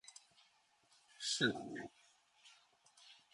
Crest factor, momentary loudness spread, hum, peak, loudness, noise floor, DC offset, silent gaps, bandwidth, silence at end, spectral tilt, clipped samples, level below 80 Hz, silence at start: 28 dB; 28 LU; none; -18 dBFS; -40 LUFS; -74 dBFS; under 0.1%; none; 11.5 kHz; 0.2 s; -2.5 dB/octave; under 0.1%; -84 dBFS; 0.05 s